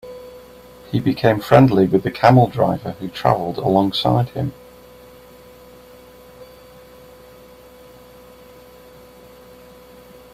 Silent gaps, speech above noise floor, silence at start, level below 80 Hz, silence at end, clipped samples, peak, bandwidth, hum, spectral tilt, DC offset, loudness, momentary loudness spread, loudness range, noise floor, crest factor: none; 28 dB; 0.05 s; -50 dBFS; 3.9 s; under 0.1%; 0 dBFS; 15.5 kHz; none; -7.5 dB/octave; under 0.1%; -17 LUFS; 15 LU; 10 LU; -44 dBFS; 20 dB